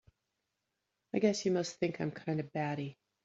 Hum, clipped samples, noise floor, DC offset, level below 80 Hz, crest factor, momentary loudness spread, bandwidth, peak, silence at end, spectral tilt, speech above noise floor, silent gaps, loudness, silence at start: none; under 0.1%; -86 dBFS; under 0.1%; -74 dBFS; 20 dB; 8 LU; 8 kHz; -16 dBFS; 0.35 s; -5.5 dB/octave; 52 dB; none; -35 LUFS; 1.15 s